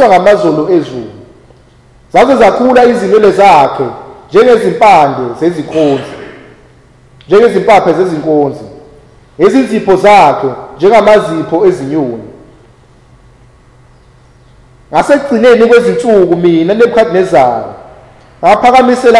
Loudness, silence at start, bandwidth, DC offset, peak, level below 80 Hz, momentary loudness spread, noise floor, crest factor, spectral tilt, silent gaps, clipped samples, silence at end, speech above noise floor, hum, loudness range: -7 LUFS; 0 s; 12 kHz; under 0.1%; 0 dBFS; -42 dBFS; 11 LU; -41 dBFS; 8 dB; -6 dB/octave; none; 7%; 0 s; 35 dB; none; 6 LU